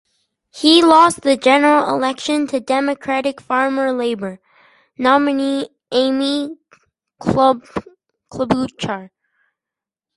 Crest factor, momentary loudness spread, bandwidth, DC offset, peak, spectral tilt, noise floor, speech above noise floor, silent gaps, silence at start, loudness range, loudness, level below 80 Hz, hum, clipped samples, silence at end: 18 dB; 14 LU; 11.5 kHz; under 0.1%; 0 dBFS; -4.5 dB/octave; -87 dBFS; 71 dB; none; 0.55 s; 7 LU; -16 LUFS; -52 dBFS; none; under 0.1%; 1.1 s